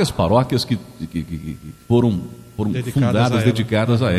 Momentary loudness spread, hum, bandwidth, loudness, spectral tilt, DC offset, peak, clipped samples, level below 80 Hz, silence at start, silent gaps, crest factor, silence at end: 13 LU; none; 14.5 kHz; -19 LUFS; -7 dB/octave; under 0.1%; -2 dBFS; under 0.1%; -40 dBFS; 0 s; none; 18 dB; 0 s